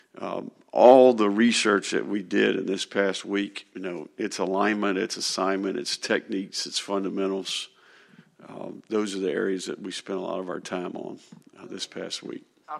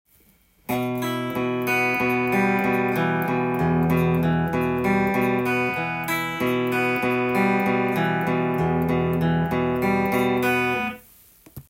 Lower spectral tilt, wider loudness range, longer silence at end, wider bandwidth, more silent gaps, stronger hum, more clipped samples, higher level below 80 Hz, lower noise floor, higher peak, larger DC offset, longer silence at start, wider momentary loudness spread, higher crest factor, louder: second, -3.5 dB/octave vs -6.5 dB/octave; first, 10 LU vs 1 LU; about the same, 0 s vs 0.1 s; second, 12.5 kHz vs 16.5 kHz; neither; neither; neither; second, -78 dBFS vs -52 dBFS; about the same, -55 dBFS vs -58 dBFS; first, -2 dBFS vs -10 dBFS; neither; second, 0.15 s vs 0.7 s; first, 16 LU vs 5 LU; first, 24 dB vs 14 dB; second, -25 LUFS vs -22 LUFS